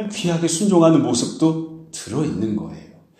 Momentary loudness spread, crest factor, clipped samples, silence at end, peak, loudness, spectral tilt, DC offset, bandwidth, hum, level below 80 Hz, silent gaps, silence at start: 15 LU; 18 dB; under 0.1%; 0.35 s; -2 dBFS; -19 LUFS; -5.5 dB/octave; under 0.1%; 14 kHz; none; -56 dBFS; none; 0 s